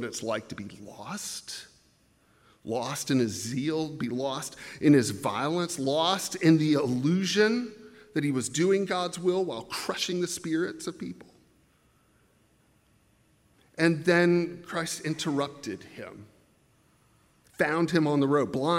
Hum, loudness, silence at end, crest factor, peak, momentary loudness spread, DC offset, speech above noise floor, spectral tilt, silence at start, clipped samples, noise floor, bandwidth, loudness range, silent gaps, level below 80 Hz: none; -27 LUFS; 0 s; 20 dB; -10 dBFS; 18 LU; under 0.1%; 38 dB; -5 dB/octave; 0 s; under 0.1%; -65 dBFS; 16 kHz; 9 LU; none; -70 dBFS